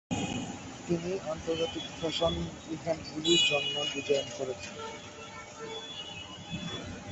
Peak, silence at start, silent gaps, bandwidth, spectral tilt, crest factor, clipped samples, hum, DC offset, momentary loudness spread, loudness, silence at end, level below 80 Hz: -12 dBFS; 0.1 s; none; 8.2 kHz; -3.5 dB/octave; 22 dB; under 0.1%; none; under 0.1%; 16 LU; -32 LUFS; 0 s; -54 dBFS